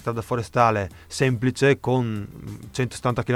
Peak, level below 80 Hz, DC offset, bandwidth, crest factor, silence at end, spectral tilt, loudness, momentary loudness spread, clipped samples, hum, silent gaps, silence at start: -4 dBFS; -50 dBFS; under 0.1%; 14.5 kHz; 20 dB; 0 s; -6 dB/octave; -23 LUFS; 13 LU; under 0.1%; none; none; 0 s